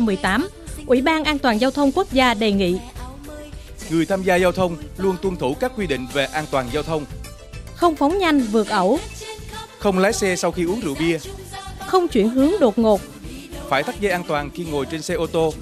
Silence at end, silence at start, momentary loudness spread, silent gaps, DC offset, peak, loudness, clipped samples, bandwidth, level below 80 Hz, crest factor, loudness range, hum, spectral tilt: 0 s; 0 s; 18 LU; none; under 0.1%; -4 dBFS; -20 LUFS; under 0.1%; 15 kHz; -40 dBFS; 16 dB; 3 LU; none; -5 dB/octave